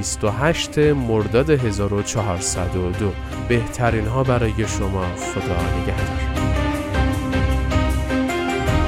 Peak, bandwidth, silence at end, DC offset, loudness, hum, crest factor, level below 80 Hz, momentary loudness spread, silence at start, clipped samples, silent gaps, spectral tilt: -2 dBFS; 16 kHz; 0 s; under 0.1%; -21 LUFS; none; 16 dB; -28 dBFS; 5 LU; 0 s; under 0.1%; none; -5.5 dB/octave